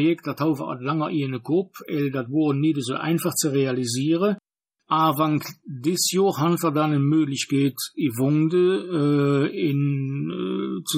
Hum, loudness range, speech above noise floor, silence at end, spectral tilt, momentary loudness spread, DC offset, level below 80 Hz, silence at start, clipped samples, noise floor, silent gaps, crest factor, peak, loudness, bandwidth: none; 2 LU; 54 dB; 0 s; -5.5 dB/octave; 7 LU; under 0.1%; -72 dBFS; 0 s; under 0.1%; -76 dBFS; none; 14 dB; -8 dBFS; -23 LUFS; 16 kHz